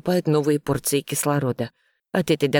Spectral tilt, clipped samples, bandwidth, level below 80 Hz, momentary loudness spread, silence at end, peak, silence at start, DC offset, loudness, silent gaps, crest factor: -5 dB/octave; under 0.1%; 19 kHz; -56 dBFS; 7 LU; 0 s; -6 dBFS; 0.05 s; under 0.1%; -23 LUFS; none; 16 dB